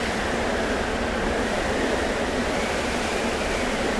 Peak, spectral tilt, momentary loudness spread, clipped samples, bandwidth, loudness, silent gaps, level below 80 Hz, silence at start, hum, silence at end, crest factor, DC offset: -12 dBFS; -4 dB/octave; 1 LU; under 0.1%; 11 kHz; -24 LUFS; none; -36 dBFS; 0 s; none; 0 s; 14 dB; under 0.1%